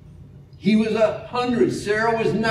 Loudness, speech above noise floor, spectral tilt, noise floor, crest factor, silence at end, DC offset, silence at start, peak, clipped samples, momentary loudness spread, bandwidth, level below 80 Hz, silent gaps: -21 LUFS; 23 dB; -6 dB/octave; -43 dBFS; 16 dB; 0 s; under 0.1%; 0.05 s; -6 dBFS; under 0.1%; 5 LU; 11.5 kHz; -52 dBFS; none